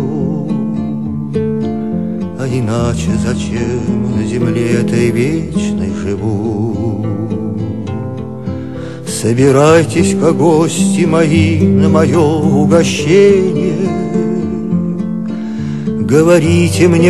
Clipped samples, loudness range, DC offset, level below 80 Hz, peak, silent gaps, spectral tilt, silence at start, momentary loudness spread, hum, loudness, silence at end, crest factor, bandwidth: 0.2%; 7 LU; 2%; -38 dBFS; 0 dBFS; none; -6.5 dB/octave; 0 s; 11 LU; none; -13 LUFS; 0 s; 12 dB; 13 kHz